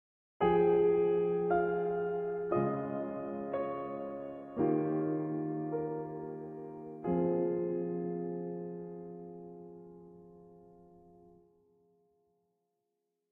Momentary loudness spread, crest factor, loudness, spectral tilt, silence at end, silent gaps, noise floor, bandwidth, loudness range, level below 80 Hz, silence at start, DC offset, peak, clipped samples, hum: 18 LU; 18 dB; -34 LUFS; -8 dB/octave; 2.5 s; none; -84 dBFS; 3.6 kHz; 17 LU; -66 dBFS; 0.4 s; under 0.1%; -16 dBFS; under 0.1%; none